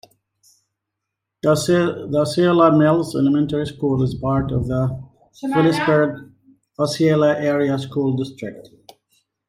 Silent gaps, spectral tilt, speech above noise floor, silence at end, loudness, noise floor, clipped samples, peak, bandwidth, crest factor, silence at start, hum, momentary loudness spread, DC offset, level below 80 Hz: none; -6.5 dB/octave; 63 dB; 0.85 s; -19 LUFS; -81 dBFS; under 0.1%; -4 dBFS; 15.5 kHz; 16 dB; 1.45 s; none; 10 LU; under 0.1%; -48 dBFS